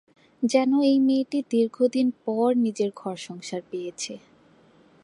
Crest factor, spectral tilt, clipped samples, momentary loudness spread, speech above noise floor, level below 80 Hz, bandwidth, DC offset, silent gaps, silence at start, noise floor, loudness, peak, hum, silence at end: 18 dB; -5 dB/octave; under 0.1%; 14 LU; 33 dB; -78 dBFS; 11.5 kHz; under 0.1%; none; 0.4 s; -57 dBFS; -24 LUFS; -8 dBFS; none; 0.85 s